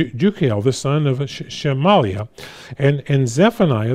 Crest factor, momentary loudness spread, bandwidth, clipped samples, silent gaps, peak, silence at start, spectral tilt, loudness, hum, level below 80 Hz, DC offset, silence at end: 14 dB; 12 LU; 13.5 kHz; under 0.1%; none; -2 dBFS; 0 s; -6.5 dB/octave; -18 LUFS; none; -52 dBFS; under 0.1%; 0 s